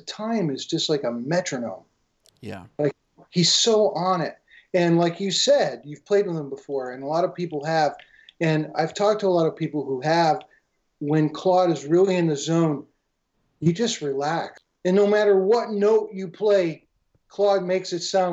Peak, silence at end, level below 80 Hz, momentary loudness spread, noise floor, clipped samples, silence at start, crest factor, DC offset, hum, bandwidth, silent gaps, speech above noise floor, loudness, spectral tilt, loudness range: -8 dBFS; 0 s; -70 dBFS; 12 LU; -73 dBFS; under 0.1%; 0.05 s; 14 dB; under 0.1%; none; 8.4 kHz; none; 51 dB; -22 LUFS; -5 dB/octave; 3 LU